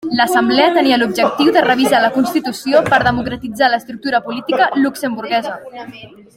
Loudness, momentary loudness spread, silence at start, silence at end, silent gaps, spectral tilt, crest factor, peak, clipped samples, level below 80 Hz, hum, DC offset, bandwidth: -14 LUFS; 11 LU; 0 s; 0.3 s; none; -4.5 dB/octave; 14 dB; 0 dBFS; under 0.1%; -48 dBFS; none; under 0.1%; 16.5 kHz